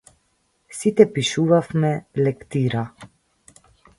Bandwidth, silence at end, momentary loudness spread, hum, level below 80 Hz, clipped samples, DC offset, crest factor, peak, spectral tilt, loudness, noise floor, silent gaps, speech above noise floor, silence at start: 11.5 kHz; 0.9 s; 10 LU; none; -58 dBFS; under 0.1%; under 0.1%; 22 dB; 0 dBFS; -6 dB/octave; -20 LUFS; -67 dBFS; none; 47 dB; 0.7 s